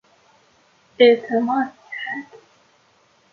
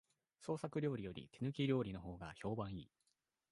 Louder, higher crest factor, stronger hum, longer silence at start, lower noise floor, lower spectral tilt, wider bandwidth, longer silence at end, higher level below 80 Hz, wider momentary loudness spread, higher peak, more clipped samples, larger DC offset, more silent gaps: first, -19 LUFS vs -44 LUFS; about the same, 20 dB vs 18 dB; neither; first, 1 s vs 0.4 s; second, -59 dBFS vs -86 dBFS; second, -5.5 dB/octave vs -7.5 dB/octave; second, 6.6 kHz vs 11.5 kHz; first, 0.95 s vs 0.65 s; second, -74 dBFS vs -66 dBFS; first, 16 LU vs 12 LU; first, -2 dBFS vs -26 dBFS; neither; neither; neither